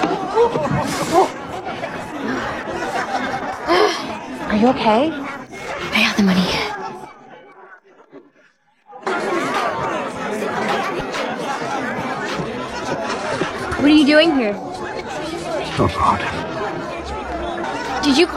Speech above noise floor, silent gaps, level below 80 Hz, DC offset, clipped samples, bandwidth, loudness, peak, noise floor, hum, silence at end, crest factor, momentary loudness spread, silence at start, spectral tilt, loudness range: 40 dB; none; -44 dBFS; under 0.1%; under 0.1%; 15 kHz; -20 LUFS; -2 dBFS; -56 dBFS; none; 0 s; 18 dB; 12 LU; 0 s; -5 dB/octave; 6 LU